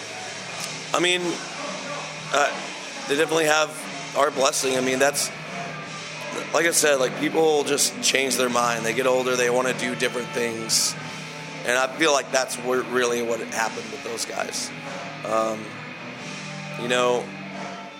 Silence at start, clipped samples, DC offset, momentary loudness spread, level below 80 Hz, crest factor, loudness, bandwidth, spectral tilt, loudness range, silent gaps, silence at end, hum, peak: 0 s; under 0.1%; under 0.1%; 13 LU; -72 dBFS; 22 dB; -23 LUFS; 17 kHz; -2 dB/octave; 6 LU; none; 0 s; none; -2 dBFS